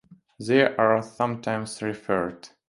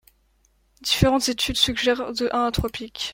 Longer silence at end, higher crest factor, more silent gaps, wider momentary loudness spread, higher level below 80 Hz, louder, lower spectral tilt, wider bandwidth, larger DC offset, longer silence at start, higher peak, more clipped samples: first, 0.2 s vs 0 s; about the same, 20 dB vs 22 dB; neither; about the same, 11 LU vs 10 LU; second, -62 dBFS vs -40 dBFS; second, -25 LUFS vs -22 LUFS; first, -5.5 dB/octave vs -4 dB/octave; second, 11.5 kHz vs 16.5 kHz; neither; second, 0.1 s vs 0.8 s; about the same, -4 dBFS vs -2 dBFS; neither